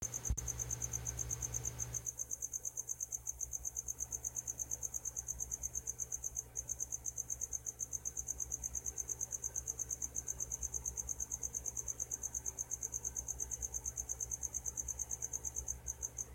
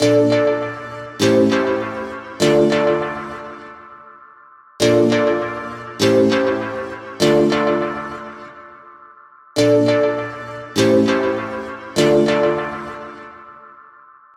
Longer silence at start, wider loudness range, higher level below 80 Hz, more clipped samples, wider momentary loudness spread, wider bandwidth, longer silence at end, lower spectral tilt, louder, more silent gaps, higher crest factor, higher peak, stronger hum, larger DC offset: about the same, 0 s vs 0 s; about the same, 1 LU vs 3 LU; about the same, -54 dBFS vs -52 dBFS; neither; second, 2 LU vs 18 LU; about the same, 16.5 kHz vs 16 kHz; second, 0 s vs 0.7 s; second, -2.5 dB/octave vs -5.5 dB/octave; second, -40 LUFS vs -17 LUFS; neither; about the same, 18 dB vs 16 dB; second, -24 dBFS vs -2 dBFS; neither; neither